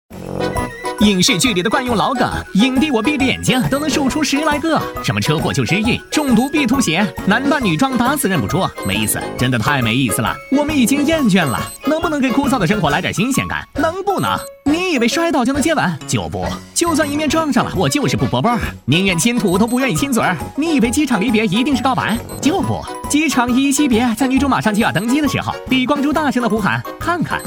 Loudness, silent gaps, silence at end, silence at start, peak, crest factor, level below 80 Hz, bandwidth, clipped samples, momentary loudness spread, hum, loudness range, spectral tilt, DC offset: -16 LUFS; none; 0 s; 0.1 s; 0 dBFS; 16 dB; -38 dBFS; over 20 kHz; under 0.1%; 5 LU; none; 2 LU; -4.5 dB/octave; under 0.1%